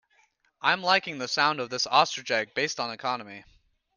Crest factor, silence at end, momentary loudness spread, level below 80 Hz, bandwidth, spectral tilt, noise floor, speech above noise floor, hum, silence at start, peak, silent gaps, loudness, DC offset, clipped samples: 24 dB; 0.55 s; 9 LU; -72 dBFS; 10.5 kHz; -2 dB/octave; -67 dBFS; 40 dB; none; 0.65 s; -6 dBFS; none; -26 LUFS; under 0.1%; under 0.1%